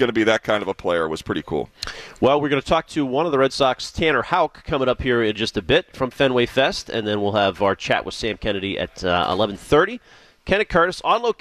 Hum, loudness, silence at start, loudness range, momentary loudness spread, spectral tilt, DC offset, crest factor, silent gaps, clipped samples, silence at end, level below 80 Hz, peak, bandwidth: none; -21 LUFS; 0 s; 1 LU; 7 LU; -5 dB/octave; under 0.1%; 16 dB; none; under 0.1%; 0.05 s; -42 dBFS; -4 dBFS; 14 kHz